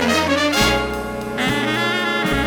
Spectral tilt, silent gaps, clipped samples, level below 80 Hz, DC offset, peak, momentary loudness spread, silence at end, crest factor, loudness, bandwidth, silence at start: -3.5 dB/octave; none; under 0.1%; -36 dBFS; under 0.1%; -2 dBFS; 9 LU; 0 s; 18 dB; -18 LUFS; over 20 kHz; 0 s